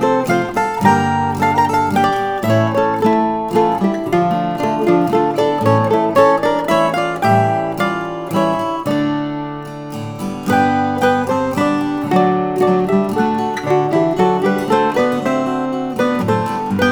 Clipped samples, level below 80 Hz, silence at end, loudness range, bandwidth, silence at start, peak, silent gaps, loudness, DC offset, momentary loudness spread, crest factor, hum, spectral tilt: under 0.1%; -48 dBFS; 0 s; 3 LU; over 20 kHz; 0 s; 0 dBFS; none; -16 LUFS; under 0.1%; 5 LU; 16 dB; none; -6.5 dB/octave